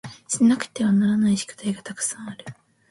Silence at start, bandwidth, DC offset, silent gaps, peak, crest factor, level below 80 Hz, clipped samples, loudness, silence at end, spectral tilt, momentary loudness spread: 0.05 s; 11.5 kHz; under 0.1%; none; -6 dBFS; 16 dB; -62 dBFS; under 0.1%; -22 LUFS; 0.35 s; -4.5 dB/octave; 17 LU